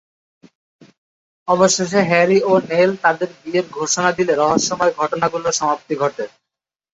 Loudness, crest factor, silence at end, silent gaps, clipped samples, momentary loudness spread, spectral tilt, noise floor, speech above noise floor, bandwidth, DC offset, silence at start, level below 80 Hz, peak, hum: -17 LUFS; 18 dB; 0.65 s; none; under 0.1%; 8 LU; -3.5 dB/octave; -84 dBFS; 67 dB; 8.4 kHz; under 0.1%; 1.45 s; -58 dBFS; 0 dBFS; none